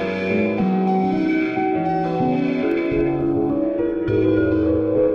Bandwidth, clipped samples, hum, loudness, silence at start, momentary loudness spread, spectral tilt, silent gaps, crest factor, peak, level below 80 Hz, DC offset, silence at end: 6.4 kHz; under 0.1%; none; -20 LUFS; 0 s; 3 LU; -9.5 dB/octave; none; 12 dB; -8 dBFS; -44 dBFS; under 0.1%; 0 s